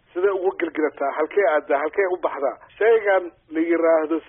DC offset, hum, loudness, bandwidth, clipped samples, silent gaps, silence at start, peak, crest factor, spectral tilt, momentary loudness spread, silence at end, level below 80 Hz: under 0.1%; none; -21 LUFS; 3.7 kHz; under 0.1%; none; 0.15 s; -8 dBFS; 14 dB; 3 dB/octave; 7 LU; 0.1 s; -66 dBFS